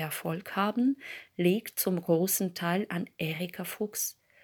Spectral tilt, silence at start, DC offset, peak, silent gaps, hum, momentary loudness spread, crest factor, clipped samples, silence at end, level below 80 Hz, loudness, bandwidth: -4.5 dB/octave; 0 s; under 0.1%; -12 dBFS; none; none; 8 LU; 18 dB; under 0.1%; 0.3 s; -78 dBFS; -30 LUFS; over 20 kHz